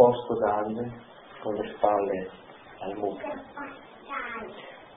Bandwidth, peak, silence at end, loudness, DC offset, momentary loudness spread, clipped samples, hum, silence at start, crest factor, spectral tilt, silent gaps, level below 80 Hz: 3.9 kHz; -4 dBFS; 0 s; -30 LUFS; under 0.1%; 20 LU; under 0.1%; none; 0 s; 24 dB; -10 dB/octave; none; -62 dBFS